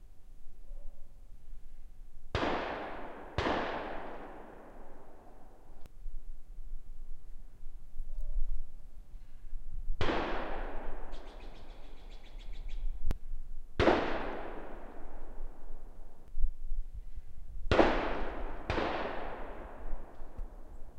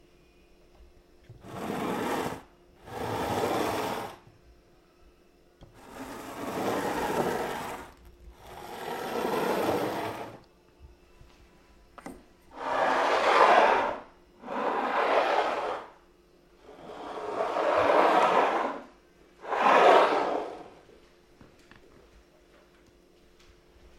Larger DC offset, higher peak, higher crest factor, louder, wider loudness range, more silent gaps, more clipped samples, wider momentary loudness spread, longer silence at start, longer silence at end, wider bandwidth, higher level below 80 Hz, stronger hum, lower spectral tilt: neither; second, -12 dBFS vs -6 dBFS; about the same, 22 dB vs 24 dB; second, -37 LUFS vs -27 LUFS; first, 14 LU vs 11 LU; neither; neither; about the same, 23 LU vs 23 LU; second, 0 s vs 0.8 s; second, 0 s vs 3.25 s; second, 6.4 kHz vs 16.5 kHz; first, -40 dBFS vs -60 dBFS; neither; first, -6.5 dB/octave vs -4 dB/octave